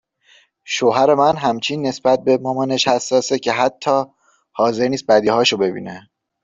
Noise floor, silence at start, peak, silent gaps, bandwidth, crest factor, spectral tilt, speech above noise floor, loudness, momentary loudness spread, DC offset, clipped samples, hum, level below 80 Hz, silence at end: -54 dBFS; 0.65 s; -2 dBFS; none; 8 kHz; 16 dB; -4 dB/octave; 37 dB; -17 LUFS; 9 LU; under 0.1%; under 0.1%; none; -60 dBFS; 0.45 s